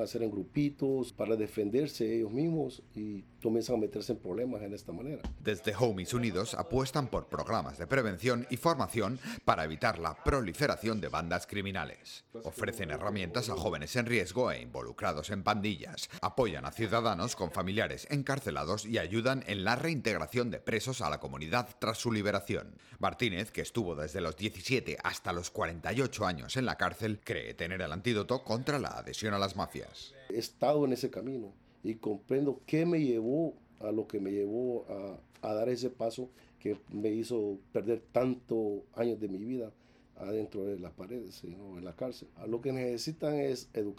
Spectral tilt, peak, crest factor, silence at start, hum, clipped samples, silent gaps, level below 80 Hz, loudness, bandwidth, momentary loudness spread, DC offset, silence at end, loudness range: -5.5 dB/octave; -12 dBFS; 22 dB; 0 s; none; under 0.1%; none; -56 dBFS; -34 LUFS; 17.5 kHz; 10 LU; under 0.1%; 0 s; 4 LU